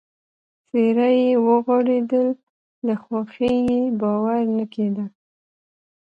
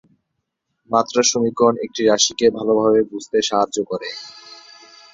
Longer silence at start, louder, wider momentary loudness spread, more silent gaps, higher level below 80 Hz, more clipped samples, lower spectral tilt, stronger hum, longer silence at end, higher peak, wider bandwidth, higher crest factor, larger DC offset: second, 0.75 s vs 0.9 s; about the same, -20 LUFS vs -18 LUFS; about the same, 10 LU vs 12 LU; first, 2.43-2.82 s vs none; about the same, -58 dBFS vs -60 dBFS; neither; first, -8.5 dB/octave vs -3 dB/octave; neither; first, 1.05 s vs 0.6 s; second, -6 dBFS vs 0 dBFS; second, 5 kHz vs 7.8 kHz; about the same, 16 dB vs 20 dB; neither